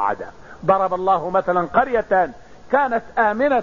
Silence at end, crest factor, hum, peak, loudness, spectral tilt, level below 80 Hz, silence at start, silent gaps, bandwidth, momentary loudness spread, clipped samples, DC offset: 0 s; 16 dB; none; -4 dBFS; -19 LUFS; -7 dB/octave; -50 dBFS; 0 s; none; 7.2 kHz; 7 LU; under 0.1%; 0.6%